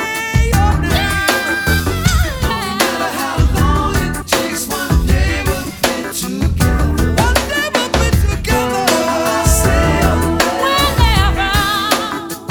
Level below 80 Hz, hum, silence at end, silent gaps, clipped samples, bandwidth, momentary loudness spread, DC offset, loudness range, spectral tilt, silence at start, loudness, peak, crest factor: -20 dBFS; none; 0 s; none; under 0.1%; over 20 kHz; 5 LU; under 0.1%; 3 LU; -4.5 dB/octave; 0 s; -15 LUFS; 0 dBFS; 14 dB